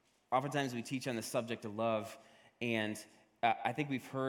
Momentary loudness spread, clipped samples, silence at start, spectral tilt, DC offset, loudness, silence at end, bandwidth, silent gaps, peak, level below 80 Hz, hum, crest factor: 8 LU; under 0.1%; 0.3 s; -5 dB/octave; under 0.1%; -37 LUFS; 0 s; 17.5 kHz; none; -16 dBFS; -80 dBFS; none; 22 dB